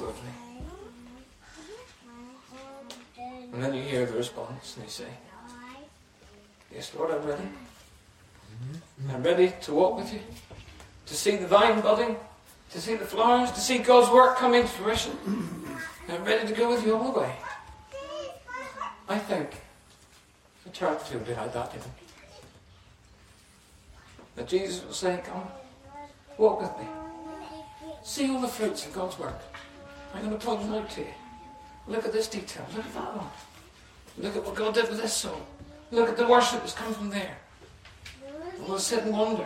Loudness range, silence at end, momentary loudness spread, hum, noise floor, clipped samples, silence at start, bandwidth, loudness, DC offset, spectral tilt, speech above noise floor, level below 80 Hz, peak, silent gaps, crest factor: 15 LU; 0 s; 24 LU; none; -58 dBFS; under 0.1%; 0 s; 16 kHz; -27 LUFS; under 0.1%; -4 dB/octave; 31 dB; -56 dBFS; -6 dBFS; none; 24 dB